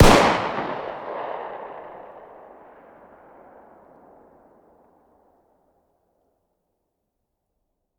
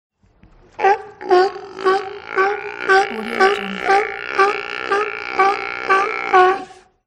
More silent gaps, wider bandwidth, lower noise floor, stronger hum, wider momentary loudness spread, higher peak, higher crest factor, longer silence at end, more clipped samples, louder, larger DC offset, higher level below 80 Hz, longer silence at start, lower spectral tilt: neither; first, 20 kHz vs 11 kHz; first, -77 dBFS vs -51 dBFS; neither; first, 29 LU vs 7 LU; about the same, 0 dBFS vs 0 dBFS; first, 26 dB vs 18 dB; first, 5.8 s vs 0.35 s; neither; second, -23 LUFS vs -18 LUFS; neither; first, -34 dBFS vs -58 dBFS; second, 0 s vs 0.8 s; first, -5 dB/octave vs -3.5 dB/octave